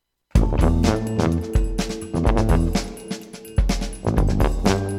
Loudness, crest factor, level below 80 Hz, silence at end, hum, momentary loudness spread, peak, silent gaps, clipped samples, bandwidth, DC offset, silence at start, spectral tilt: -22 LUFS; 18 dB; -24 dBFS; 0 s; none; 8 LU; -2 dBFS; none; under 0.1%; 13.5 kHz; under 0.1%; 0.35 s; -6.5 dB/octave